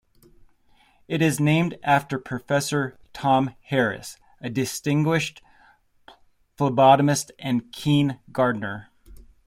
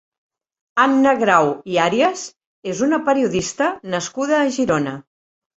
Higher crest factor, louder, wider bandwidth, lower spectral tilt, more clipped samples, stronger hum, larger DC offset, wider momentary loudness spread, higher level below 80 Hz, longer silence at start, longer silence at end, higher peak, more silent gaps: about the same, 20 dB vs 18 dB; second, -23 LUFS vs -18 LUFS; first, 16 kHz vs 8.2 kHz; about the same, -5.5 dB/octave vs -4.5 dB/octave; neither; neither; neither; about the same, 12 LU vs 13 LU; about the same, -58 dBFS vs -56 dBFS; first, 1.1 s vs 0.75 s; second, 0.25 s vs 0.55 s; about the same, -4 dBFS vs -2 dBFS; second, none vs 2.47-2.63 s